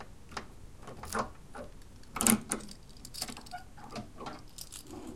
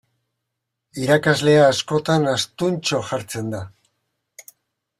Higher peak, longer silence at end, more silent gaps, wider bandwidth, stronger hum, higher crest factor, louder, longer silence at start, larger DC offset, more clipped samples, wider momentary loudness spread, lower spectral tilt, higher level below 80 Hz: about the same, -4 dBFS vs -2 dBFS; second, 0 s vs 0.6 s; neither; about the same, 16.5 kHz vs 15.5 kHz; neither; first, 36 dB vs 20 dB; second, -36 LUFS vs -19 LUFS; second, 0 s vs 0.95 s; first, 0.2% vs under 0.1%; neither; first, 22 LU vs 15 LU; second, -2.5 dB/octave vs -5 dB/octave; about the same, -54 dBFS vs -58 dBFS